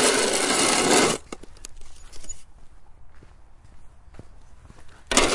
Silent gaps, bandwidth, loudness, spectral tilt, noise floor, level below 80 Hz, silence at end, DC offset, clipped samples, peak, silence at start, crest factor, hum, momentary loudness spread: none; 11.5 kHz; -20 LUFS; -1.5 dB/octave; -46 dBFS; -44 dBFS; 0 s; under 0.1%; under 0.1%; -2 dBFS; 0 s; 24 dB; none; 26 LU